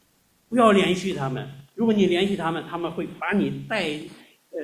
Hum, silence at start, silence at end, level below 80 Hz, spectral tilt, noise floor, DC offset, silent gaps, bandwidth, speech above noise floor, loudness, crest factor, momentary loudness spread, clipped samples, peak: none; 0.5 s; 0 s; -58 dBFS; -6 dB/octave; -64 dBFS; under 0.1%; none; 14.5 kHz; 41 dB; -23 LUFS; 20 dB; 16 LU; under 0.1%; -4 dBFS